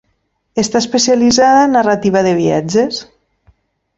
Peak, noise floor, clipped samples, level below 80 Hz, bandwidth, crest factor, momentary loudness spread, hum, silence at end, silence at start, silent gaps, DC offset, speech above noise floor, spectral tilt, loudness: 0 dBFS; -64 dBFS; under 0.1%; -50 dBFS; 8 kHz; 12 dB; 10 LU; none; 0.95 s; 0.55 s; none; under 0.1%; 53 dB; -4 dB/octave; -12 LUFS